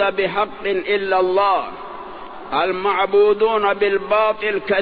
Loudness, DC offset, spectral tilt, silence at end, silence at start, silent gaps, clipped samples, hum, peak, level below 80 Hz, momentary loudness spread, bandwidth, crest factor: -18 LUFS; 0.8%; -7.5 dB/octave; 0 s; 0 s; none; under 0.1%; none; -4 dBFS; -52 dBFS; 17 LU; 5 kHz; 14 dB